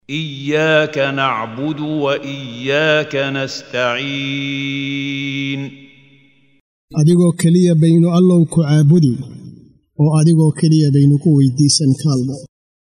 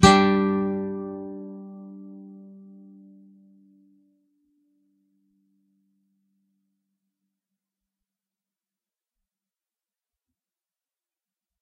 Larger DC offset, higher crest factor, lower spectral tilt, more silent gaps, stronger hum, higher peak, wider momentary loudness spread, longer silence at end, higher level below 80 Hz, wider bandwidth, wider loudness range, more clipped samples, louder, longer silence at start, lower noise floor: neither; second, 14 dB vs 28 dB; first, -6 dB/octave vs -4.5 dB/octave; first, 6.60-6.88 s vs none; neither; about the same, 0 dBFS vs 0 dBFS; second, 11 LU vs 28 LU; second, 0.5 s vs 9.25 s; second, -56 dBFS vs -50 dBFS; first, 11 kHz vs 6.4 kHz; second, 7 LU vs 26 LU; neither; first, -15 LUFS vs -23 LUFS; about the same, 0.1 s vs 0 s; second, -52 dBFS vs under -90 dBFS